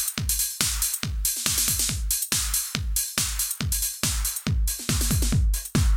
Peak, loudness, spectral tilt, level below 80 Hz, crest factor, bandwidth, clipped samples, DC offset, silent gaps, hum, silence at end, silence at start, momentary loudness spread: -4 dBFS; -24 LUFS; -2.5 dB/octave; -30 dBFS; 20 dB; 20 kHz; under 0.1%; under 0.1%; none; none; 0 s; 0 s; 4 LU